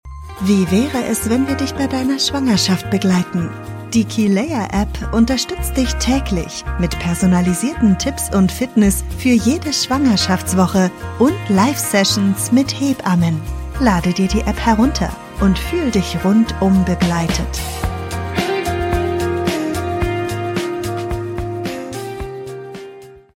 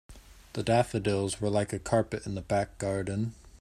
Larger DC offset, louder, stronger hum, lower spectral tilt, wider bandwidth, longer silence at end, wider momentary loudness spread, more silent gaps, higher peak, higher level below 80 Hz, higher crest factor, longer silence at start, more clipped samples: neither; first, -17 LUFS vs -30 LUFS; neither; about the same, -5 dB/octave vs -6 dB/octave; first, 16.5 kHz vs 14.5 kHz; first, 0.2 s vs 0.05 s; about the same, 9 LU vs 9 LU; neither; first, -2 dBFS vs -10 dBFS; first, -30 dBFS vs -52 dBFS; about the same, 16 dB vs 20 dB; about the same, 0.05 s vs 0.1 s; neither